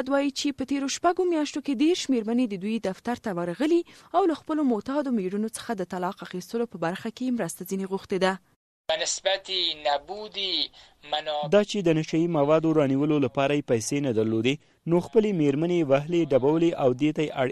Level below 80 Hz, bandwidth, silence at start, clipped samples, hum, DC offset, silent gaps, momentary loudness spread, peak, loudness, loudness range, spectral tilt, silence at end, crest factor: -62 dBFS; 13.5 kHz; 0 s; under 0.1%; none; under 0.1%; 8.56-8.84 s; 8 LU; -8 dBFS; -26 LUFS; 6 LU; -5 dB/octave; 0 s; 16 dB